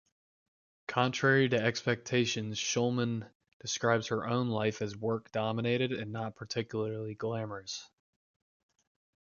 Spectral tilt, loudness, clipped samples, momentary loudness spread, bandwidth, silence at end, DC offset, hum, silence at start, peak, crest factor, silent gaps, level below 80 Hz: -4.5 dB/octave; -32 LUFS; under 0.1%; 11 LU; 7.2 kHz; 1.45 s; under 0.1%; none; 0.9 s; -12 dBFS; 20 dB; 3.35-3.40 s, 3.53-3.60 s; -70 dBFS